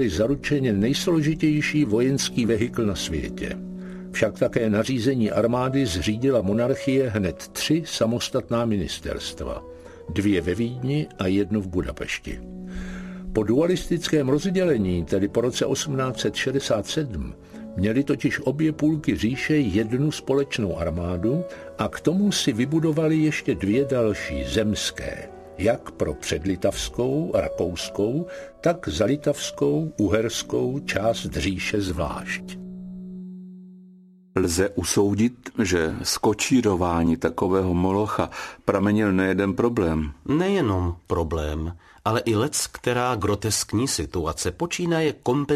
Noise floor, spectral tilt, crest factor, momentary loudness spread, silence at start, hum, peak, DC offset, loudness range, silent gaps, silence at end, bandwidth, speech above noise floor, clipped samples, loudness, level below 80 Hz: -50 dBFS; -5 dB/octave; 18 dB; 10 LU; 0 s; none; -4 dBFS; under 0.1%; 4 LU; none; 0 s; 14 kHz; 27 dB; under 0.1%; -24 LUFS; -42 dBFS